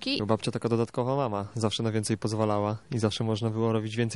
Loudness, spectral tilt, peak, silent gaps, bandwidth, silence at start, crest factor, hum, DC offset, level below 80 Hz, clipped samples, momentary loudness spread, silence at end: -28 LUFS; -6 dB/octave; -8 dBFS; none; 11.5 kHz; 0 s; 20 dB; none; 0.1%; -62 dBFS; under 0.1%; 2 LU; 0 s